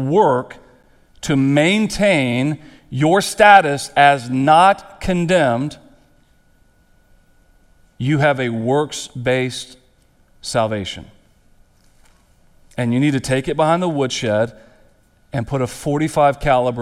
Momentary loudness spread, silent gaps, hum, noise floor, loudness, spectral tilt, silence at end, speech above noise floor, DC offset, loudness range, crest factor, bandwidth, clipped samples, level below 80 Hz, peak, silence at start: 15 LU; none; none; -55 dBFS; -17 LUFS; -5.5 dB/octave; 0 s; 38 dB; under 0.1%; 10 LU; 18 dB; 15 kHz; under 0.1%; -44 dBFS; 0 dBFS; 0 s